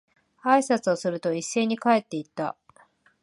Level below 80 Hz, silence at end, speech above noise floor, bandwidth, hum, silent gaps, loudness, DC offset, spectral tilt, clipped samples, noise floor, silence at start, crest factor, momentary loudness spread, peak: -78 dBFS; 0.7 s; 35 dB; 11.5 kHz; none; none; -25 LUFS; under 0.1%; -4.5 dB/octave; under 0.1%; -60 dBFS; 0.45 s; 20 dB; 12 LU; -6 dBFS